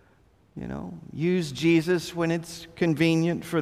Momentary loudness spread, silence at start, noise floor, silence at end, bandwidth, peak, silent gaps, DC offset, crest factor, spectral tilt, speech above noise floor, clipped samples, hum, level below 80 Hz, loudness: 16 LU; 0.55 s; -60 dBFS; 0 s; 15 kHz; -10 dBFS; none; under 0.1%; 16 dB; -6 dB/octave; 35 dB; under 0.1%; none; -56 dBFS; -25 LUFS